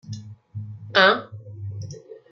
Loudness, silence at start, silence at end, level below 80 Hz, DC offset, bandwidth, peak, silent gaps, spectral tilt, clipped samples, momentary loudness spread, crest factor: -19 LUFS; 0.05 s; 0.15 s; -68 dBFS; under 0.1%; 7.6 kHz; -2 dBFS; none; -4.5 dB/octave; under 0.1%; 23 LU; 24 dB